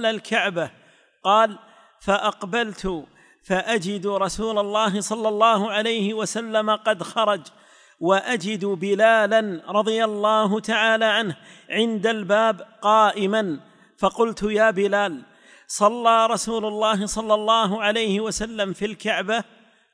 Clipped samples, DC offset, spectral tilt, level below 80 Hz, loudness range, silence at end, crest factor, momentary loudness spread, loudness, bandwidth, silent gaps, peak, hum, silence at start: under 0.1%; under 0.1%; -4 dB/octave; -52 dBFS; 4 LU; 0.5 s; 18 dB; 9 LU; -21 LUFS; 10.5 kHz; none; -4 dBFS; none; 0 s